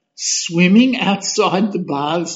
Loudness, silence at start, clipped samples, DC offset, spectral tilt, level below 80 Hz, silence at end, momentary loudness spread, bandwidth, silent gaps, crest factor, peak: -16 LUFS; 0.2 s; under 0.1%; under 0.1%; -4 dB/octave; -66 dBFS; 0 s; 8 LU; 8.2 kHz; none; 14 dB; -2 dBFS